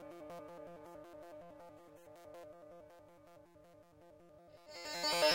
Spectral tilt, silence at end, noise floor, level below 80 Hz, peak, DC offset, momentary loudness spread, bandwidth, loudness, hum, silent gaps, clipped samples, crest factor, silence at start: -1.5 dB/octave; 0 s; -63 dBFS; -78 dBFS; -20 dBFS; under 0.1%; 21 LU; 16 kHz; -44 LUFS; none; none; under 0.1%; 24 dB; 0 s